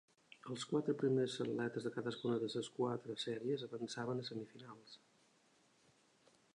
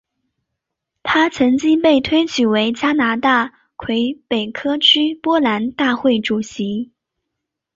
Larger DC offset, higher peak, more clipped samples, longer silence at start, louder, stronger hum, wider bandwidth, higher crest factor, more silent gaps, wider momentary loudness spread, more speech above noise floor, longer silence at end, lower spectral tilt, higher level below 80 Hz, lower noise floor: neither; second, -24 dBFS vs -2 dBFS; neither; second, 0.45 s vs 1.05 s; second, -41 LUFS vs -16 LUFS; neither; first, 11 kHz vs 7.8 kHz; about the same, 18 dB vs 16 dB; neither; first, 19 LU vs 10 LU; second, 32 dB vs 63 dB; first, 1.6 s vs 0.9 s; first, -5.5 dB/octave vs -4 dB/octave; second, -86 dBFS vs -52 dBFS; second, -73 dBFS vs -79 dBFS